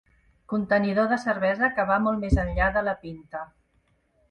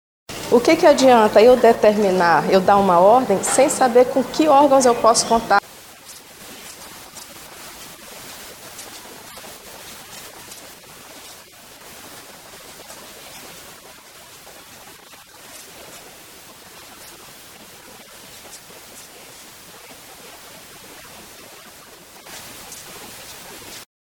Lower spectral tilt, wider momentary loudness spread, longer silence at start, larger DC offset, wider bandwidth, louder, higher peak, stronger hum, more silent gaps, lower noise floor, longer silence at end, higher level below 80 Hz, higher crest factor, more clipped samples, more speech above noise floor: first, -7.5 dB/octave vs -3.5 dB/octave; second, 14 LU vs 27 LU; first, 0.5 s vs 0.3 s; neither; second, 9.2 kHz vs 19.5 kHz; second, -24 LUFS vs -14 LUFS; second, -8 dBFS vs -2 dBFS; neither; neither; first, -67 dBFS vs -44 dBFS; first, 0.85 s vs 0.2 s; first, -36 dBFS vs -54 dBFS; about the same, 18 dB vs 20 dB; neither; first, 43 dB vs 30 dB